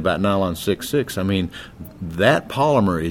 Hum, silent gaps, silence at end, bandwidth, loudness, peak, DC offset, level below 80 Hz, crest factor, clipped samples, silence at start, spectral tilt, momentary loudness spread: none; none; 0 s; 16.5 kHz; -20 LUFS; 0 dBFS; under 0.1%; -44 dBFS; 20 dB; under 0.1%; 0 s; -6 dB/octave; 14 LU